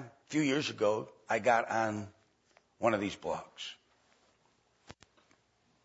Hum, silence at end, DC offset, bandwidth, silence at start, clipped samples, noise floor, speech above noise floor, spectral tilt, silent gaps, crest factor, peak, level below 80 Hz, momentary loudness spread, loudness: none; 0.9 s; under 0.1%; 7.6 kHz; 0 s; under 0.1%; -72 dBFS; 40 dB; -3.5 dB/octave; none; 22 dB; -14 dBFS; -74 dBFS; 15 LU; -33 LUFS